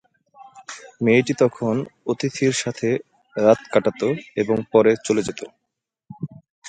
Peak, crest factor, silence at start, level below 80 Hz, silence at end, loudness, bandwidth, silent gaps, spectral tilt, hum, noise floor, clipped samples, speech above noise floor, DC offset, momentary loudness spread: -2 dBFS; 20 dB; 0.4 s; -62 dBFS; 0 s; -21 LUFS; 9.4 kHz; 6.50-6.62 s; -5.5 dB/octave; none; -80 dBFS; under 0.1%; 61 dB; under 0.1%; 19 LU